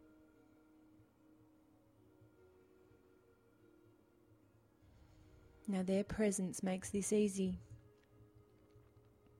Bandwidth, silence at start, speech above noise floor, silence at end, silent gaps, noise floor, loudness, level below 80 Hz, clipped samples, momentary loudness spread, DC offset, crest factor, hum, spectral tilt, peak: 14.5 kHz; 5.65 s; 32 dB; 1.15 s; none; -70 dBFS; -39 LUFS; -68 dBFS; under 0.1%; 16 LU; under 0.1%; 20 dB; none; -5.5 dB/octave; -24 dBFS